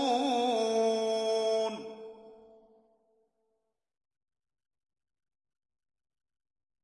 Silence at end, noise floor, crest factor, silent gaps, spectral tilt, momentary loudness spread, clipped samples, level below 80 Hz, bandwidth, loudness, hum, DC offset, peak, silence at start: 4.5 s; -82 dBFS; 18 dB; none; -3 dB/octave; 17 LU; under 0.1%; -84 dBFS; 11.5 kHz; -29 LUFS; none; under 0.1%; -18 dBFS; 0 s